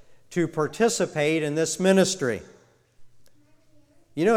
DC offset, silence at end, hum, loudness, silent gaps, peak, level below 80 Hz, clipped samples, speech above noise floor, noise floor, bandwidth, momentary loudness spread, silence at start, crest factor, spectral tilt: under 0.1%; 0 s; none; -24 LUFS; none; -6 dBFS; -62 dBFS; under 0.1%; 33 dB; -56 dBFS; 16 kHz; 10 LU; 0.1 s; 18 dB; -4.5 dB/octave